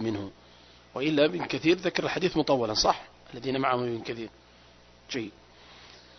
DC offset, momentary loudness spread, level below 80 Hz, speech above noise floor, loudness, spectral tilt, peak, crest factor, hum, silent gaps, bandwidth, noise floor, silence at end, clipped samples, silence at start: under 0.1%; 18 LU; -56 dBFS; 28 dB; -28 LUFS; -4.5 dB/octave; -8 dBFS; 22 dB; 60 Hz at -60 dBFS; none; 6.4 kHz; -55 dBFS; 0.2 s; under 0.1%; 0 s